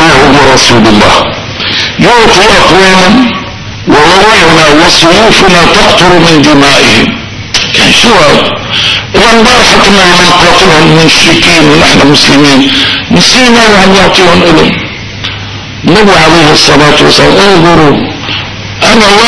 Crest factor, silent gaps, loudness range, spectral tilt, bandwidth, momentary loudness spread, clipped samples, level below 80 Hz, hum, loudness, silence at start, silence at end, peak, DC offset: 4 dB; none; 2 LU; -3.5 dB/octave; 11 kHz; 10 LU; 20%; -24 dBFS; none; -2 LUFS; 0 s; 0 s; 0 dBFS; 9%